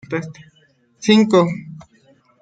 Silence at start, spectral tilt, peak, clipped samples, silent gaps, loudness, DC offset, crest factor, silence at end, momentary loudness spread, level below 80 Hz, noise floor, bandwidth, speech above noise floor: 0.1 s; -6 dB/octave; -2 dBFS; under 0.1%; none; -16 LUFS; under 0.1%; 18 dB; 0.6 s; 22 LU; -62 dBFS; -57 dBFS; 9 kHz; 41 dB